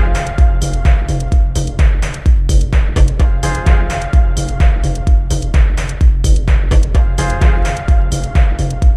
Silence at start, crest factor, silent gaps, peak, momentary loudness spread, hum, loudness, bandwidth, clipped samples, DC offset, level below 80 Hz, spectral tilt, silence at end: 0 s; 10 dB; none; 0 dBFS; 3 LU; none; -14 LUFS; 11 kHz; under 0.1%; under 0.1%; -12 dBFS; -6 dB/octave; 0 s